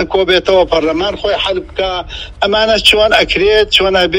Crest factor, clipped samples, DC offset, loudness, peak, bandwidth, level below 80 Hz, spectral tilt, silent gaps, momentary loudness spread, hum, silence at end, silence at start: 12 dB; 0.3%; under 0.1%; -11 LUFS; 0 dBFS; over 20 kHz; -32 dBFS; -3.5 dB/octave; none; 9 LU; none; 0 s; 0 s